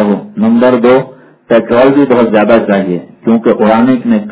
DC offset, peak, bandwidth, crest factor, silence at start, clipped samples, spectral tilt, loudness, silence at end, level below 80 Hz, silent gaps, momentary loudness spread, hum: under 0.1%; 0 dBFS; 4 kHz; 8 dB; 0 s; 2%; -11 dB/octave; -9 LUFS; 0 s; -48 dBFS; none; 6 LU; none